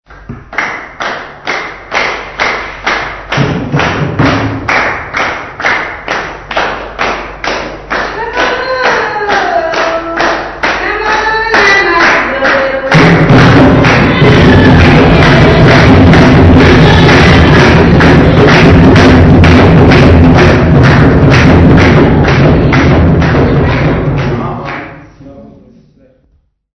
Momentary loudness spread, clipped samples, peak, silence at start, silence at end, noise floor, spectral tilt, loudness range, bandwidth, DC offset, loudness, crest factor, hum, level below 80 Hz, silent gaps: 12 LU; 6%; 0 dBFS; 0.1 s; 1.3 s; -52 dBFS; -7 dB/octave; 10 LU; 8.8 kHz; under 0.1%; -6 LUFS; 6 dB; none; -18 dBFS; none